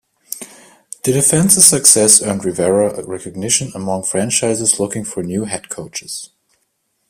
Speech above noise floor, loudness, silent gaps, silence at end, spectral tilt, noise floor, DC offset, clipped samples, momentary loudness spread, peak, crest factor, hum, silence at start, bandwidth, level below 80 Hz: 52 dB; -13 LUFS; none; 0.85 s; -3 dB/octave; -67 dBFS; under 0.1%; 0.1%; 20 LU; 0 dBFS; 16 dB; none; 0.3 s; over 20 kHz; -54 dBFS